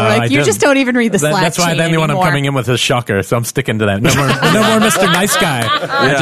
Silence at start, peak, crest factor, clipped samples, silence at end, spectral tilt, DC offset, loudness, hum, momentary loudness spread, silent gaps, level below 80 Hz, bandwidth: 0 s; -2 dBFS; 12 dB; under 0.1%; 0 s; -4.5 dB/octave; 0.2%; -12 LUFS; none; 5 LU; none; -42 dBFS; 14 kHz